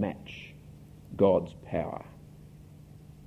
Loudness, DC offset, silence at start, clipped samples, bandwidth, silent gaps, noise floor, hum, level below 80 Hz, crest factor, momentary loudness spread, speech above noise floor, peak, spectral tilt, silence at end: -29 LUFS; under 0.1%; 0 s; under 0.1%; 14 kHz; none; -50 dBFS; none; -54 dBFS; 24 dB; 26 LU; 21 dB; -10 dBFS; -8.5 dB/octave; 0.65 s